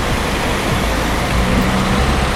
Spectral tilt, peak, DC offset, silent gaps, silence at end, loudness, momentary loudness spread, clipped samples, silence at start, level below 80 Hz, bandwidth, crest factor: -5 dB/octave; -2 dBFS; under 0.1%; none; 0 s; -16 LUFS; 2 LU; under 0.1%; 0 s; -22 dBFS; 16.5 kHz; 14 dB